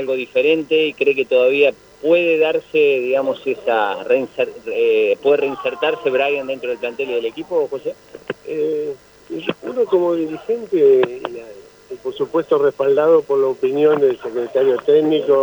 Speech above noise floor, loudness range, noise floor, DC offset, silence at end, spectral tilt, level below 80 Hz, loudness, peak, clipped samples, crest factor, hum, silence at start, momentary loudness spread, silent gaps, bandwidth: 23 dB; 6 LU; -40 dBFS; under 0.1%; 0 s; -6 dB/octave; -62 dBFS; -17 LUFS; -2 dBFS; under 0.1%; 14 dB; none; 0 s; 12 LU; none; over 20 kHz